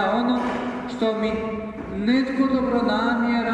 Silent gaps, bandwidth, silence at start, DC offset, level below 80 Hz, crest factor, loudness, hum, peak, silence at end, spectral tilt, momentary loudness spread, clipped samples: none; 8.4 kHz; 0 s; under 0.1%; -48 dBFS; 14 dB; -23 LUFS; none; -8 dBFS; 0 s; -6.5 dB/octave; 8 LU; under 0.1%